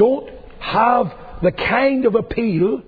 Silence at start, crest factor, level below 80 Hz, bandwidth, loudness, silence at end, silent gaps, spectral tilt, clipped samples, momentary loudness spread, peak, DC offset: 0 s; 14 dB; -40 dBFS; 5 kHz; -18 LUFS; 0.05 s; none; -9 dB/octave; under 0.1%; 10 LU; -2 dBFS; under 0.1%